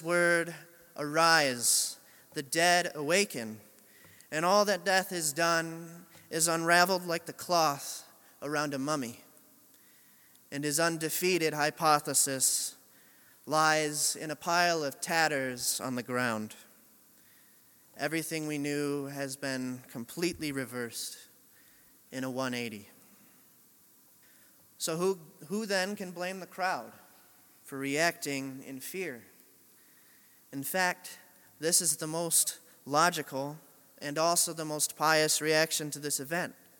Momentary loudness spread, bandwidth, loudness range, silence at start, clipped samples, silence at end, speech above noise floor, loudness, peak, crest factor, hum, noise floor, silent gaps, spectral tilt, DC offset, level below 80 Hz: 16 LU; 17.5 kHz; 9 LU; 0 s; under 0.1%; 0.25 s; 31 dB; -30 LUFS; -6 dBFS; 26 dB; none; -61 dBFS; none; -2.5 dB/octave; under 0.1%; -78 dBFS